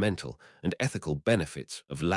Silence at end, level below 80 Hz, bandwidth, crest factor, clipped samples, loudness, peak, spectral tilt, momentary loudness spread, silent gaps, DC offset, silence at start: 0 s; -56 dBFS; 12 kHz; 18 dB; under 0.1%; -31 LUFS; -12 dBFS; -5.5 dB/octave; 12 LU; none; under 0.1%; 0 s